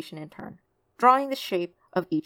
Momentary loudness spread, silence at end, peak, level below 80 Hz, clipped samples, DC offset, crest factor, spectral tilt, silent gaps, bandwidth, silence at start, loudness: 22 LU; 0.05 s; -6 dBFS; -74 dBFS; under 0.1%; under 0.1%; 22 dB; -5.5 dB/octave; none; 17.5 kHz; 0 s; -24 LUFS